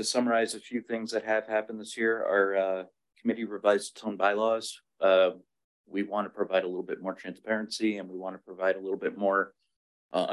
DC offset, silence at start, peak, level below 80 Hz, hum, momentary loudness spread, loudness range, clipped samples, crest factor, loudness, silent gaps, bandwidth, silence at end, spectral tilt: under 0.1%; 0 s; -10 dBFS; -82 dBFS; none; 11 LU; 4 LU; under 0.1%; 18 dB; -29 LUFS; 5.64-5.84 s, 9.76-10.09 s; 12.5 kHz; 0 s; -3.5 dB/octave